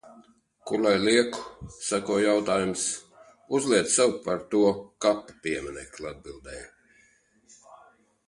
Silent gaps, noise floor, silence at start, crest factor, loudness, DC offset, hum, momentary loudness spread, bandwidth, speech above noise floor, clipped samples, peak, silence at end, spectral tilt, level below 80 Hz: none; -63 dBFS; 0.1 s; 20 dB; -25 LUFS; under 0.1%; none; 19 LU; 11.5 kHz; 37 dB; under 0.1%; -6 dBFS; 0.55 s; -3.5 dB/octave; -58 dBFS